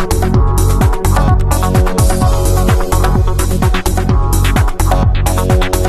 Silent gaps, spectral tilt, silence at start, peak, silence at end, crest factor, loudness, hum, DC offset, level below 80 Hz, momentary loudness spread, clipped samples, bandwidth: none; -5.5 dB/octave; 0 s; 0 dBFS; 0 s; 10 dB; -13 LUFS; none; 1%; -14 dBFS; 2 LU; under 0.1%; 14 kHz